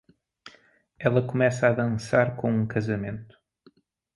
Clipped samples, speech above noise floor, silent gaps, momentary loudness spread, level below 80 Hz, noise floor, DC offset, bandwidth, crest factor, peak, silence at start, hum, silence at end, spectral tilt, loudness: under 0.1%; 36 dB; none; 8 LU; -58 dBFS; -60 dBFS; under 0.1%; 11.5 kHz; 20 dB; -6 dBFS; 0.45 s; none; 0.9 s; -7.5 dB/octave; -25 LUFS